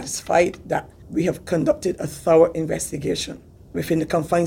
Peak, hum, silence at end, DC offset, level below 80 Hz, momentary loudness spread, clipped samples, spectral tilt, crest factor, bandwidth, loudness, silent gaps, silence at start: -2 dBFS; none; 0 s; under 0.1%; -48 dBFS; 13 LU; under 0.1%; -5 dB/octave; 18 dB; 17 kHz; -22 LUFS; none; 0 s